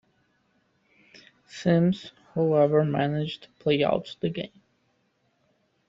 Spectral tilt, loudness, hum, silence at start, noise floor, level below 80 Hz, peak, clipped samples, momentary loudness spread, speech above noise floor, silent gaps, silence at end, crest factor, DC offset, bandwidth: -7.5 dB/octave; -26 LUFS; none; 1.55 s; -70 dBFS; -64 dBFS; -10 dBFS; under 0.1%; 13 LU; 46 dB; none; 1.45 s; 18 dB; under 0.1%; 7.6 kHz